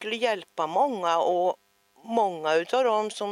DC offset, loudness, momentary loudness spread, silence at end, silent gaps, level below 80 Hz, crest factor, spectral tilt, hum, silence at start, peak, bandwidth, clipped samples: under 0.1%; -26 LUFS; 6 LU; 0 s; none; -86 dBFS; 16 dB; -3.5 dB/octave; none; 0 s; -10 dBFS; 13 kHz; under 0.1%